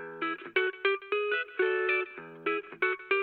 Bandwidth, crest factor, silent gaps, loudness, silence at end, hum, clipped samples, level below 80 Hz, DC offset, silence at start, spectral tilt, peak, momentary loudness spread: 4.8 kHz; 18 dB; none; -30 LUFS; 0 s; none; under 0.1%; -82 dBFS; under 0.1%; 0 s; -6.5 dB/octave; -14 dBFS; 7 LU